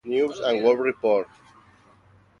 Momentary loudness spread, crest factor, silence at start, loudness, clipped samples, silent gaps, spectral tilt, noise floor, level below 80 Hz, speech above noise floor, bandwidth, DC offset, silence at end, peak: 5 LU; 18 dB; 0.05 s; -23 LUFS; under 0.1%; none; -5 dB/octave; -56 dBFS; -68 dBFS; 34 dB; 7.4 kHz; under 0.1%; 1.15 s; -6 dBFS